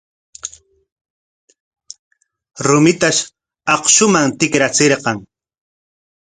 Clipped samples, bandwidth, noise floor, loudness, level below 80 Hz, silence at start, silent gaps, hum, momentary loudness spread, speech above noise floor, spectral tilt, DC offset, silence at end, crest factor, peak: under 0.1%; 10.5 kHz; -34 dBFS; -13 LUFS; -56 dBFS; 0.45 s; 0.92-1.48 s, 1.60-1.71 s, 1.99-2.11 s; none; 20 LU; 21 dB; -3 dB/octave; under 0.1%; 1.05 s; 18 dB; 0 dBFS